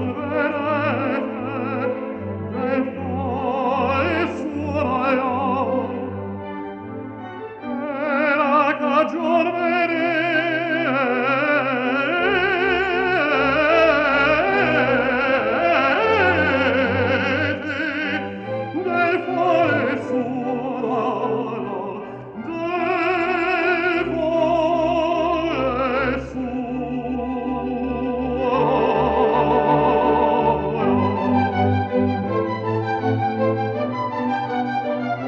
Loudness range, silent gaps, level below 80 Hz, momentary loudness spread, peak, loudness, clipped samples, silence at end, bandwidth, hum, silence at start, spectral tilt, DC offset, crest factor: 6 LU; none; -46 dBFS; 10 LU; -4 dBFS; -20 LUFS; under 0.1%; 0 s; 7.8 kHz; none; 0 s; -7.5 dB/octave; under 0.1%; 16 dB